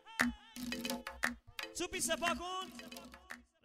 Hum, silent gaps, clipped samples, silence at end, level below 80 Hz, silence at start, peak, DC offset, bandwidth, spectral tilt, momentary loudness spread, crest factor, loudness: none; none; under 0.1%; 0.2 s; -60 dBFS; 0.05 s; -14 dBFS; under 0.1%; 16 kHz; -2 dB/octave; 16 LU; 26 dB; -39 LUFS